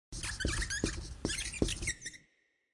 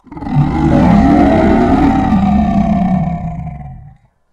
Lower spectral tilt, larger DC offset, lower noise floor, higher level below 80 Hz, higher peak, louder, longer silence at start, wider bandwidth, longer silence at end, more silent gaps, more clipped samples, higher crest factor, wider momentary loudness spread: second, -3 dB/octave vs -9 dB/octave; neither; first, -74 dBFS vs -41 dBFS; second, -44 dBFS vs -24 dBFS; second, -14 dBFS vs 0 dBFS; second, -36 LUFS vs -11 LUFS; about the same, 0.1 s vs 0.1 s; first, 11.5 kHz vs 8.2 kHz; about the same, 0.55 s vs 0.5 s; neither; neither; first, 24 dB vs 12 dB; second, 8 LU vs 15 LU